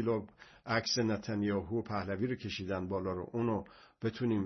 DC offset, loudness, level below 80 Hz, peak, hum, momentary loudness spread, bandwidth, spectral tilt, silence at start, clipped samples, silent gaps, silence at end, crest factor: under 0.1%; -36 LUFS; -66 dBFS; -16 dBFS; none; 8 LU; 6.2 kHz; -5 dB/octave; 0 s; under 0.1%; none; 0 s; 18 dB